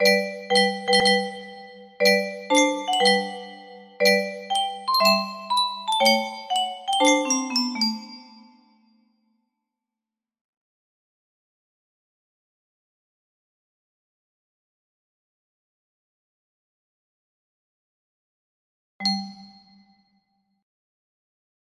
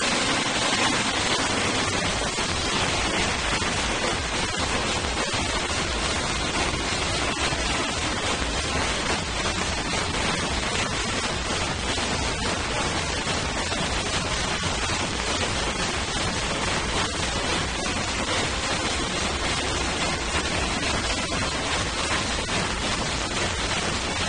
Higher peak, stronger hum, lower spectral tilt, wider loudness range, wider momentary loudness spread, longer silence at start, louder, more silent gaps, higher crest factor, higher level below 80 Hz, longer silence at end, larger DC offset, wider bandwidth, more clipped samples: about the same, -4 dBFS vs -6 dBFS; neither; about the same, -2.5 dB/octave vs -2.5 dB/octave; first, 13 LU vs 2 LU; first, 15 LU vs 3 LU; about the same, 0 s vs 0 s; first, -21 LUFS vs -24 LUFS; first, 10.41-18.99 s vs none; about the same, 22 dB vs 20 dB; second, -72 dBFS vs -36 dBFS; first, 2.15 s vs 0 s; neither; first, 15.5 kHz vs 10 kHz; neither